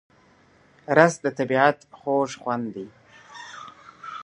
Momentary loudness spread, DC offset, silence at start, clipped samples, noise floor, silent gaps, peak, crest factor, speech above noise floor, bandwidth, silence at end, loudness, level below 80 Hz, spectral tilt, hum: 24 LU; under 0.1%; 0.9 s; under 0.1%; -57 dBFS; none; 0 dBFS; 24 dB; 35 dB; 11 kHz; 0 s; -22 LUFS; -70 dBFS; -5.5 dB/octave; none